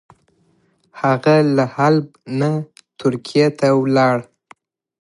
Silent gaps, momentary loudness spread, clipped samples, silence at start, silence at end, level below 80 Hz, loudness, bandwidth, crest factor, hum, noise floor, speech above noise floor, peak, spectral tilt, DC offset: none; 9 LU; under 0.1%; 0.95 s; 0.8 s; -66 dBFS; -17 LUFS; 11.5 kHz; 16 dB; none; -60 dBFS; 44 dB; -2 dBFS; -7 dB/octave; under 0.1%